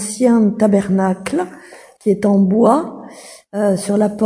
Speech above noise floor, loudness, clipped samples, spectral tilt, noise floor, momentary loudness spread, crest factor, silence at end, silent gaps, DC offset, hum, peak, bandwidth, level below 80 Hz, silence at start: 23 dB; -15 LUFS; under 0.1%; -7 dB/octave; -37 dBFS; 15 LU; 16 dB; 0 s; none; under 0.1%; none; 0 dBFS; 11 kHz; -54 dBFS; 0 s